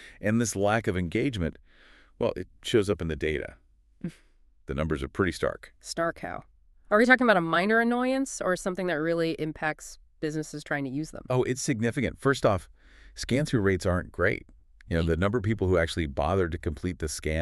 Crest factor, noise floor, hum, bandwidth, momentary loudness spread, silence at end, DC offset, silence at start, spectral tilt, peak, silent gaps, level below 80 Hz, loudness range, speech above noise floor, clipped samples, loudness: 22 dB; -59 dBFS; none; 13.5 kHz; 13 LU; 0 s; under 0.1%; 0 s; -5.5 dB/octave; -6 dBFS; none; -46 dBFS; 7 LU; 32 dB; under 0.1%; -27 LUFS